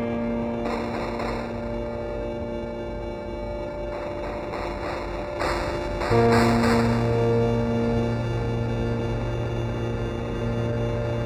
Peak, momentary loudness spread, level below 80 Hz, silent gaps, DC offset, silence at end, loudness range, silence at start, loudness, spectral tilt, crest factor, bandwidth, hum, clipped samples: -6 dBFS; 11 LU; -36 dBFS; none; under 0.1%; 0 s; 9 LU; 0 s; -26 LUFS; -7 dB/octave; 18 dB; 12 kHz; none; under 0.1%